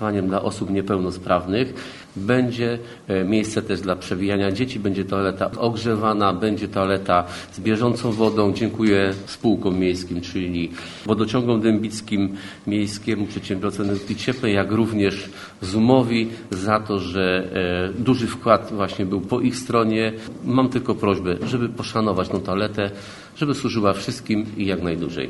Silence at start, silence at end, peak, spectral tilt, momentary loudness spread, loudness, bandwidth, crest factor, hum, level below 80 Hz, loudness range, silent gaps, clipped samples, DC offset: 0 s; 0 s; 0 dBFS; -6.5 dB/octave; 7 LU; -22 LUFS; 12 kHz; 22 dB; none; -50 dBFS; 3 LU; none; under 0.1%; under 0.1%